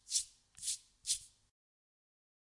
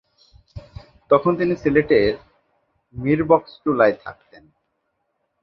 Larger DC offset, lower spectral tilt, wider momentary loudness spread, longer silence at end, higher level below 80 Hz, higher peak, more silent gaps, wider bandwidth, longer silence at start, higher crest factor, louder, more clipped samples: neither; second, 4 dB/octave vs -8.5 dB/octave; second, 6 LU vs 21 LU; about the same, 1.25 s vs 1.3 s; second, -76 dBFS vs -48 dBFS; second, -18 dBFS vs 0 dBFS; neither; first, 11.5 kHz vs 6.4 kHz; second, 0.1 s vs 0.55 s; first, 28 dB vs 22 dB; second, -39 LUFS vs -19 LUFS; neither